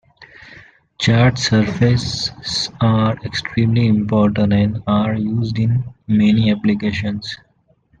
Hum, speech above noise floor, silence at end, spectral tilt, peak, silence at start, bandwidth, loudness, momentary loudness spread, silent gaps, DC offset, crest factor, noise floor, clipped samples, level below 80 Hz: none; 41 dB; 0.65 s; -6 dB/octave; -2 dBFS; 0.2 s; 9.2 kHz; -17 LUFS; 8 LU; none; under 0.1%; 14 dB; -57 dBFS; under 0.1%; -44 dBFS